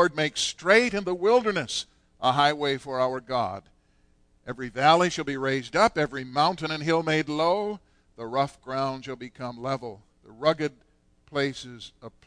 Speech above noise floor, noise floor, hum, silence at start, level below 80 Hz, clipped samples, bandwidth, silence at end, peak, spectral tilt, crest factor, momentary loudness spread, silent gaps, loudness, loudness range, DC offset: 37 dB; -63 dBFS; none; 0 s; -60 dBFS; under 0.1%; 10.5 kHz; 0.2 s; -6 dBFS; -4 dB/octave; 20 dB; 18 LU; none; -25 LUFS; 7 LU; under 0.1%